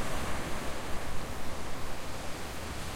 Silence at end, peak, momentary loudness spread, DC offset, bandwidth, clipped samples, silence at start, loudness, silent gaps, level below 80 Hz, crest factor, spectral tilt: 0 s; -18 dBFS; 4 LU; under 0.1%; 16 kHz; under 0.1%; 0 s; -39 LUFS; none; -42 dBFS; 12 dB; -4 dB/octave